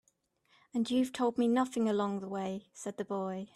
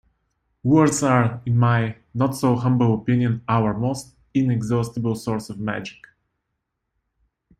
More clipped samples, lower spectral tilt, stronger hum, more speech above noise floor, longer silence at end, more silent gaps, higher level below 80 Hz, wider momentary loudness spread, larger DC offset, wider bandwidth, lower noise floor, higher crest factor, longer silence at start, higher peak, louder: neither; second, -5.5 dB/octave vs -7 dB/octave; neither; second, 41 dB vs 58 dB; second, 0.1 s vs 1.7 s; neither; second, -76 dBFS vs -54 dBFS; about the same, 10 LU vs 11 LU; neither; about the same, 13 kHz vs 13.5 kHz; second, -74 dBFS vs -78 dBFS; about the same, 16 dB vs 18 dB; about the same, 0.75 s vs 0.65 s; second, -18 dBFS vs -4 dBFS; second, -33 LUFS vs -21 LUFS